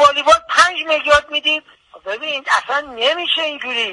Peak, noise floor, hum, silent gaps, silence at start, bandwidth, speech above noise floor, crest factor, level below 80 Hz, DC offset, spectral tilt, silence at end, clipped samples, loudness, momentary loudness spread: 0 dBFS; -39 dBFS; none; none; 0 s; 11.5 kHz; 20 dB; 16 dB; -48 dBFS; under 0.1%; -0.5 dB/octave; 0 s; under 0.1%; -15 LUFS; 10 LU